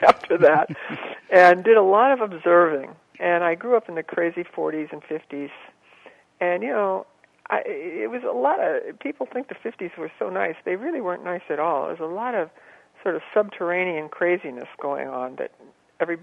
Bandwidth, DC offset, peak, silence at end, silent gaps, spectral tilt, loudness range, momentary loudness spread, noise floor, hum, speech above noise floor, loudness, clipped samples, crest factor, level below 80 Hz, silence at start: 9.6 kHz; under 0.1%; -2 dBFS; 0.05 s; none; -6.5 dB/octave; 10 LU; 16 LU; -51 dBFS; none; 29 dB; -22 LUFS; under 0.1%; 22 dB; -70 dBFS; 0 s